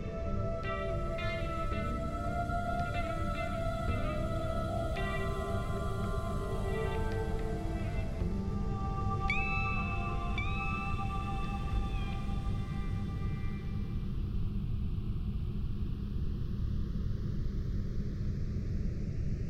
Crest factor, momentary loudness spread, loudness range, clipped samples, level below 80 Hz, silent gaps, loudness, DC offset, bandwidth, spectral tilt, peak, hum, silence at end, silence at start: 14 dB; 3 LU; 3 LU; under 0.1%; -38 dBFS; none; -36 LUFS; under 0.1%; 13.5 kHz; -7.5 dB/octave; -18 dBFS; none; 0 s; 0 s